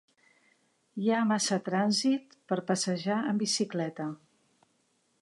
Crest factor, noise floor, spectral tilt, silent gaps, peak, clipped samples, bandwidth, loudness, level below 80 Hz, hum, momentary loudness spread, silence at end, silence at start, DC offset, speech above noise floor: 16 dB; -73 dBFS; -4 dB/octave; none; -14 dBFS; under 0.1%; 11.5 kHz; -30 LUFS; -82 dBFS; none; 10 LU; 1.05 s; 0.95 s; under 0.1%; 44 dB